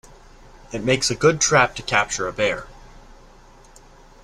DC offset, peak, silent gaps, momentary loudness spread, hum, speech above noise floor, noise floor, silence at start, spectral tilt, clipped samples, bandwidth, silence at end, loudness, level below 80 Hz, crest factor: under 0.1%; -2 dBFS; none; 11 LU; none; 27 dB; -47 dBFS; 0.7 s; -3 dB/octave; under 0.1%; 13.5 kHz; 1.25 s; -20 LUFS; -46 dBFS; 20 dB